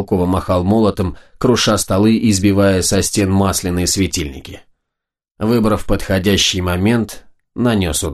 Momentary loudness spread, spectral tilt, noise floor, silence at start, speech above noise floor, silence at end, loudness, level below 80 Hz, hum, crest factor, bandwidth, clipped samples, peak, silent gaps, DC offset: 10 LU; -4.5 dB/octave; -81 dBFS; 0 s; 66 dB; 0 s; -15 LUFS; -34 dBFS; none; 14 dB; 13 kHz; under 0.1%; -2 dBFS; 5.31-5.35 s; under 0.1%